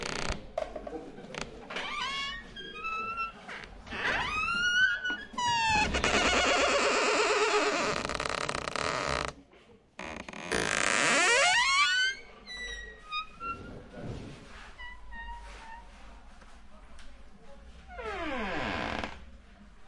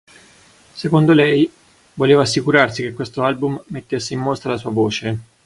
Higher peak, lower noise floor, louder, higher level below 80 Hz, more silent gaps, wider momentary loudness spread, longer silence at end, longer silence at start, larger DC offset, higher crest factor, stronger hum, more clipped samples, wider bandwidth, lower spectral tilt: second, -10 dBFS vs 0 dBFS; first, -58 dBFS vs -49 dBFS; second, -29 LUFS vs -17 LUFS; about the same, -50 dBFS vs -54 dBFS; neither; first, 20 LU vs 12 LU; second, 0 s vs 0.25 s; second, 0 s vs 0.75 s; neither; about the same, 22 dB vs 18 dB; neither; neither; about the same, 11.5 kHz vs 11.5 kHz; second, -2 dB/octave vs -6 dB/octave